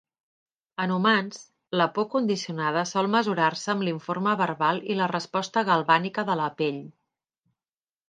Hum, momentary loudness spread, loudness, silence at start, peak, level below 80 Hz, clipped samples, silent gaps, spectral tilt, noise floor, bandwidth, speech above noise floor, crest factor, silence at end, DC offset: none; 7 LU; -25 LUFS; 0.8 s; -6 dBFS; -76 dBFS; under 0.1%; none; -5 dB/octave; under -90 dBFS; 9.4 kHz; over 65 dB; 22 dB; 1.2 s; under 0.1%